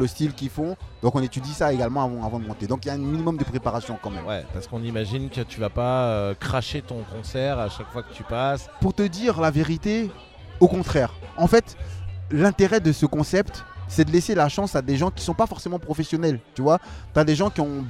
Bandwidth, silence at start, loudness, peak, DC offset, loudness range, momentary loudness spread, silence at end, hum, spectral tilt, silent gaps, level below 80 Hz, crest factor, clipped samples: 15 kHz; 0 s; -24 LUFS; 0 dBFS; under 0.1%; 6 LU; 12 LU; 0 s; none; -6.5 dB/octave; none; -40 dBFS; 24 dB; under 0.1%